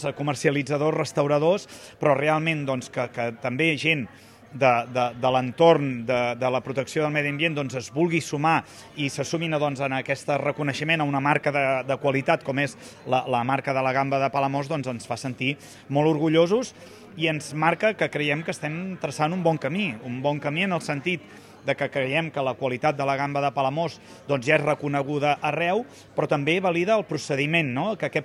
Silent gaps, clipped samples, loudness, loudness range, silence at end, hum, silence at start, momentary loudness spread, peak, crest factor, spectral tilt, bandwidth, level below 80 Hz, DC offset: none; under 0.1%; -24 LUFS; 3 LU; 0 s; none; 0 s; 8 LU; -4 dBFS; 20 dB; -5.5 dB/octave; 13.5 kHz; -66 dBFS; under 0.1%